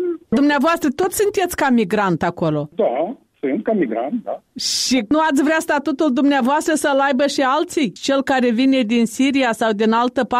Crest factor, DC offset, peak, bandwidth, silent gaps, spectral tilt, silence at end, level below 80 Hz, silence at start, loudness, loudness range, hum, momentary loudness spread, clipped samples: 10 dB; under 0.1%; -8 dBFS; 15.5 kHz; none; -4 dB/octave; 0 s; -54 dBFS; 0 s; -18 LUFS; 3 LU; none; 6 LU; under 0.1%